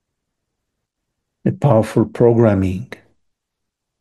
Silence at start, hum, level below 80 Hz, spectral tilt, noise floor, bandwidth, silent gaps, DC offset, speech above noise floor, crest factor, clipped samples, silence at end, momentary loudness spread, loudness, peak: 1.45 s; none; -52 dBFS; -9 dB/octave; -78 dBFS; 12.5 kHz; none; under 0.1%; 64 dB; 18 dB; under 0.1%; 1.15 s; 12 LU; -16 LUFS; 0 dBFS